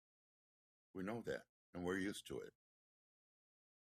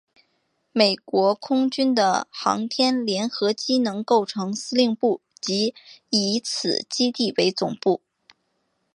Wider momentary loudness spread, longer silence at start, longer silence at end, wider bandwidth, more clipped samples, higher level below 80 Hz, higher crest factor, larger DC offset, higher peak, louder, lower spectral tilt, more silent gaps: first, 14 LU vs 5 LU; first, 0.95 s vs 0.75 s; first, 1.35 s vs 1 s; first, 15.5 kHz vs 11 kHz; neither; second, -80 dBFS vs -72 dBFS; about the same, 20 dB vs 22 dB; neither; second, -30 dBFS vs -2 dBFS; second, -48 LUFS vs -22 LUFS; about the same, -5 dB/octave vs -4 dB/octave; first, 1.49-1.73 s vs none